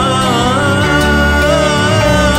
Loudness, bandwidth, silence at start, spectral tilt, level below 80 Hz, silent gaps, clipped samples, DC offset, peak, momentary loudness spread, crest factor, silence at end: -11 LUFS; 16.5 kHz; 0 s; -4.5 dB/octave; -22 dBFS; none; under 0.1%; under 0.1%; -2 dBFS; 1 LU; 10 dB; 0 s